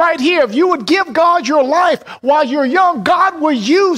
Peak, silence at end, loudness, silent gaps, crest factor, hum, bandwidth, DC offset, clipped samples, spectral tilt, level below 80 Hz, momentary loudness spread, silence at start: -2 dBFS; 0 s; -13 LUFS; none; 10 dB; none; 13 kHz; under 0.1%; under 0.1%; -4 dB/octave; -58 dBFS; 3 LU; 0 s